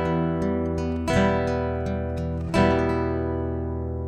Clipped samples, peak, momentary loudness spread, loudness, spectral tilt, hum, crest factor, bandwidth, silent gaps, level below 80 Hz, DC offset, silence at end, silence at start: under 0.1%; -6 dBFS; 7 LU; -25 LUFS; -7.5 dB/octave; none; 18 dB; 11 kHz; none; -36 dBFS; under 0.1%; 0 s; 0 s